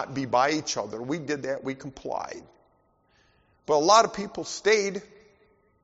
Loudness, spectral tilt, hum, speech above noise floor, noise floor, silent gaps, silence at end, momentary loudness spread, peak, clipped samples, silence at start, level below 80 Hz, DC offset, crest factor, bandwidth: -26 LUFS; -2.5 dB/octave; none; 40 dB; -66 dBFS; none; 0.8 s; 18 LU; -4 dBFS; under 0.1%; 0 s; -64 dBFS; under 0.1%; 22 dB; 8 kHz